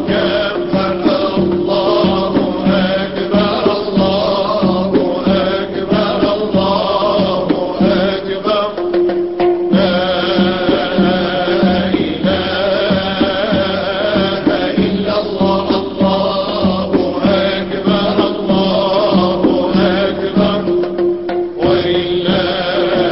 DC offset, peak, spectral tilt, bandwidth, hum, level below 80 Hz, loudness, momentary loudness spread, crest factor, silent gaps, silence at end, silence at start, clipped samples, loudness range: 0.6%; -2 dBFS; -10.5 dB/octave; 5.8 kHz; none; -38 dBFS; -14 LUFS; 3 LU; 12 dB; none; 0 s; 0 s; under 0.1%; 1 LU